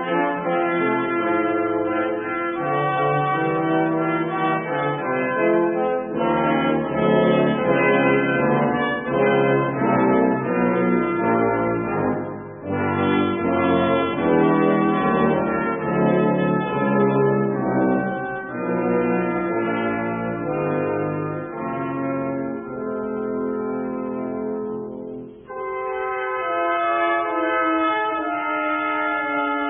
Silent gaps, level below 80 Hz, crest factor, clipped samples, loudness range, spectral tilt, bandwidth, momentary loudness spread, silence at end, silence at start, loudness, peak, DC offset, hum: none; -54 dBFS; 16 dB; under 0.1%; 7 LU; -11.5 dB/octave; 3.7 kHz; 9 LU; 0 s; 0 s; -21 LUFS; -6 dBFS; under 0.1%; none